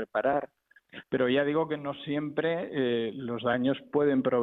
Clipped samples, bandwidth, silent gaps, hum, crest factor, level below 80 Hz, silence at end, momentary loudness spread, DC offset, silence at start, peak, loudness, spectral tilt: under 0.1%; 4.1 kHz; none; none; 14 dB; -68 dBFS; 0 s; 9 LU; under 0.1%; 0 s; -14 dBFS; -29 LUFS; -9 dB/octave